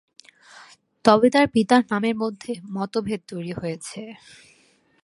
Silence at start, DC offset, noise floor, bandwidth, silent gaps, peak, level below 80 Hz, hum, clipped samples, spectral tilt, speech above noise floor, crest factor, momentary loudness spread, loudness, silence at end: 0.6 s; under 0.1%; -60 dBFS; 11.5 kHz; none; 0 dBFS; -60 dBFS; none; under 0.1%; -5.5 dB/octave; 39 dB; 24 dB; 17 LU; -22 LUFS; 0.9 s